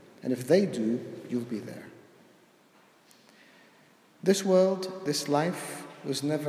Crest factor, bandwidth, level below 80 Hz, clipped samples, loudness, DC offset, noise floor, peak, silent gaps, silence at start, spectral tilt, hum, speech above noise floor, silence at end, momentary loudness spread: 20 dB; 15.5 kHz; -80 dBFS; under 0.1%; -29 LUFS; under 0.1%; -60 dBFS; -10 dBFS; none; 0.25 s; -5 dB/octave; none; 33 dB; 0 s; 15 LU